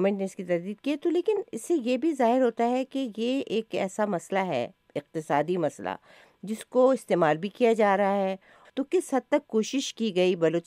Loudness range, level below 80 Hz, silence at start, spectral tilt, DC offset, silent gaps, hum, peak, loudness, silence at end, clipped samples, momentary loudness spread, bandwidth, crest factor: 4 LU; -78 dBFS; 0 s; -5.5 dB/octave; under 0.1%; none; none; -10 dBFS; -27 LUFS; 0.05 s; under 0.1%; 12 LU; 15 kHz; 18 dB